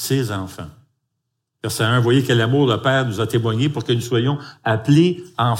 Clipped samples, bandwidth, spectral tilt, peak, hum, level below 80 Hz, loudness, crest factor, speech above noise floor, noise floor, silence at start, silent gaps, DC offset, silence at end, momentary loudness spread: under 0.1%; 16.5 kHz; -6 dB/octave; -4 dBFS; none; -58 dBFS; -18 LUFS; 16 dB; 58 dB; -76 dBFS; 0 s; none; under 0.1%; 0 s; 12 LU